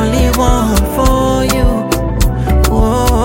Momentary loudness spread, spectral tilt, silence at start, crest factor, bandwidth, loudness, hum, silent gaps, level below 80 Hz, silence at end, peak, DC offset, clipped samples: 3 LU; -5.5 dB/octave; 0 s; 10 dB; 17 kHz; -13 LUFS; none; none; -14 dBFS; 0 s; 0 dBFS; under 0.1%; under 0.1%